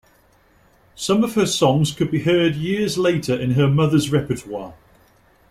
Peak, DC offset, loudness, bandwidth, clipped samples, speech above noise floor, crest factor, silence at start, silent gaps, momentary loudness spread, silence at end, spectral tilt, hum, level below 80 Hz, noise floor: -2 dBFS; under 0.1%; -19 LUFS; 15.5 kHz; under 0.1%; 37 dB; 18 dB; 1 s; none; 10 LU; 0.75 s; -5.5 dB/octave; none; -50 dBFS; -56 dBFS